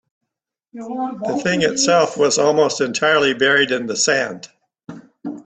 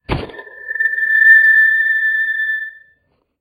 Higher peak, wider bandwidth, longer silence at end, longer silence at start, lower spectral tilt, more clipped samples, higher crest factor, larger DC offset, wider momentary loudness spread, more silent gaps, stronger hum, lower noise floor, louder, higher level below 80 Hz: about the same, -2 dBFS vs 0 dBFS; second, 9 kHz vs 16 kHz; second, 0.05 s vs 0.7 s; first, 0.75 s vs 0.1 s; second, -2.5 dB/octave vs -6 dB/octave; neither; about the same, 16 dB vs 14 dB; neither; second, 15 LU vs 20 LU; neither; neither; first, -81 dBFS vs -61 dBFS; second, -17 LUFS vs -11 LUFS; second, -62 dBFS vs -40 dBFS